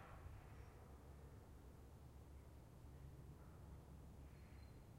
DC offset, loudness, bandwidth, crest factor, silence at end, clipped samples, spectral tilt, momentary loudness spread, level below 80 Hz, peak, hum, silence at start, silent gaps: under 0.1%; -62 LUFS; 16 kHz; 14 dB; 0 s; under 0.1%; -6.5 dB/octave; 3 LU; -64 dBFS; -46 dBFS; none; 0 s; none